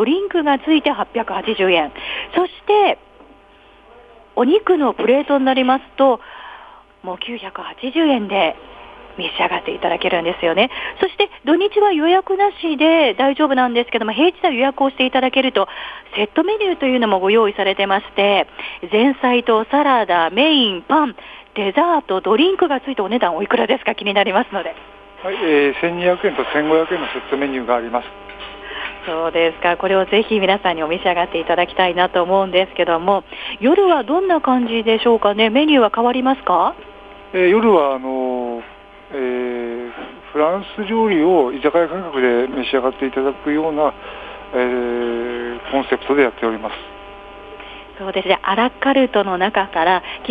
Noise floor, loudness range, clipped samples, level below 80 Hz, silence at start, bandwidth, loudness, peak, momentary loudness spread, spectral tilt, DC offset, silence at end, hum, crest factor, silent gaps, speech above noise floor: -47 dBFS; 5 LU; under 0.1%; -50 dBFS; 0 s; 5 kHz; -17 LUFS; 0 dBFS; 13 LU; -7 dB/octave; under 0.1%; 0 s; none; 16 dB; none; 30 dB